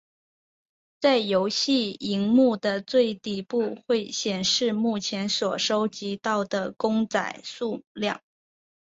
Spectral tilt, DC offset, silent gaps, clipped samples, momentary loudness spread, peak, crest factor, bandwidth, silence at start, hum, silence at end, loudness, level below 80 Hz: -4 dB/octave; under 0.1%; 7.87-7.95 s; under 0.1%; 8 LU; -8 dBFS; 18 dB; 8 kHz; 1 s; none; 0.65 s; -25 LUFS; -68 dBFS